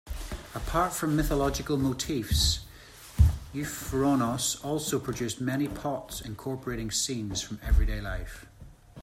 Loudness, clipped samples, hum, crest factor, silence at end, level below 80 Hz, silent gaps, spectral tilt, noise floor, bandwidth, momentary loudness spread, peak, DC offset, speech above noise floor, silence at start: -29 LUFS; under 0.1%; none; 20 dB; 0 s; -34 dBFS; none; -4.5 dB/octave; -49 dBFS; 16 kHz; 13 LU; -10 dBFS; under 0.1%; 20 dB; 0.05 s